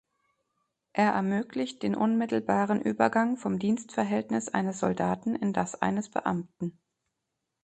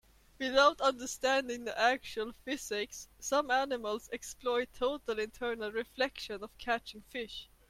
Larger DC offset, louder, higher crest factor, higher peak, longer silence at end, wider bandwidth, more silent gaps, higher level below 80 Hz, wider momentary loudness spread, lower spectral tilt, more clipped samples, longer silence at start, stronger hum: neither; first, -29 LUFS vs -34 LUFS; about the same, 22 dB vs 22 dB; first, -8 dBFS vs -12 dBFS; first, 0.9 s vs 0.25 s; second, 8.8 kHz vs 16 kHz; neither; about the same, -66 dBFS vs -62 dBFS; second, 7 LU vs 13 LU; first, -6 dB/octave vs -1.5 dB/octave; neither; first, 0.95 s vs 0.4 s; neither